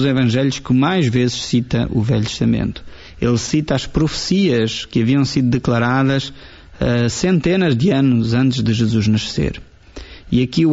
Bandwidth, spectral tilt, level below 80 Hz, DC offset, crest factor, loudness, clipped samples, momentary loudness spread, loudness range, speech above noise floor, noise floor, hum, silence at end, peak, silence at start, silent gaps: 8 kHz; -6 dB/octave; -38 dBFS; under 0.1%; 12 dB; -17 LUFS; under 0.1%; 7 LU; 2 LU; 20 dB; -36 dBFS; none; 0 s; -4 dBFS; 0 s; none